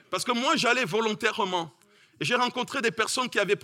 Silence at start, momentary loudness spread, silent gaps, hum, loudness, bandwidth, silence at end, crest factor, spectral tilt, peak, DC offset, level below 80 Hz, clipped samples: 0.1 s; 6 LU; none; none; -26 LUFS; 16.5 kHz; 0.05 s; 20 dB; -3 dB/octave; -6 dBFS; under 0.1%; -76 dBFS; under 0.1%